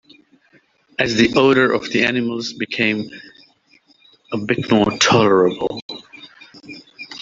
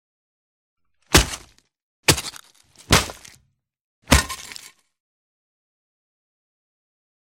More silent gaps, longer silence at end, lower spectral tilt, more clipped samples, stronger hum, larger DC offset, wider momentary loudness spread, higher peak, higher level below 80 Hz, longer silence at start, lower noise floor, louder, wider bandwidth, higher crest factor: second, 5.82-5.89 s vs 1.82-2.03 s, 3.81-4.02 s; second, 0.05 s vs 2.7 s; first, -4.5 dB/octave vs -3 dB/octave; neither; neither; neither; first, 22 LU vs 18 LU; about the same, -2 dBFS vs 0 dBFS; second, -54 dBFS vs -34 dBFS; about the same, 1 s vs 1.1 s; second, -56 dBFS vs -63 dBFS; about the same, -17 LUFS vs -19 LUFS; second, 8 kHz vs 16.5 kHz; second, 16 dB vs 26 dB